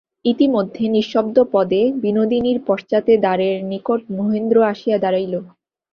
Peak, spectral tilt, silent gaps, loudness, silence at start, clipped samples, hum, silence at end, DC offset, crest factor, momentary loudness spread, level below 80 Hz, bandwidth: -2 dBFS; -8 dB/octave; none; -18 LUFS; 0.25 s; under 0.1%; none; 0.45 s; under 0.1%; 16 dB; 6 LU; -58 dBFS; 6.6 kHz